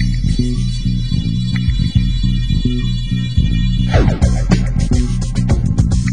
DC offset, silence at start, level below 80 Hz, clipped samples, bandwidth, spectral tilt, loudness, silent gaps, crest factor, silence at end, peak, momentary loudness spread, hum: 3%; 0 s; -18 dBFS; under 0.1%; 10 kHz; -6.5 dB/octave; -16 LUFS; none; 14 dB; 0 s; 0 dBFS; 4 LU; none